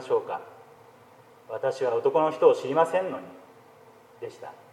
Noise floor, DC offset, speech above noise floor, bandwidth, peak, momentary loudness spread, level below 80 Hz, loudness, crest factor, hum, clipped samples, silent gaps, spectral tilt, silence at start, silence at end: -54 dBFS; under 0.1%; 28 dB; 12 kHz; -6 dBFS; 20 LU; -82 dBFS; -25 LUFS; 22 dB; none; under 0.1%; none; -5.5 dB/octave; 0 s; 0.2 s